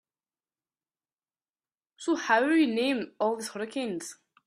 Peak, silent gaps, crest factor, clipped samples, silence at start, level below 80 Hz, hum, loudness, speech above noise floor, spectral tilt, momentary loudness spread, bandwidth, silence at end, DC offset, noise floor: -10 dBFS; none; 20 dB; under 0.1%; 2 s; -78 dBFS; none; -28 LUFS; over 63 dB; -3.5 dB/octave; 13 LU; 14 kHz; 0.35 s; under 0.1%; under -90 dBFS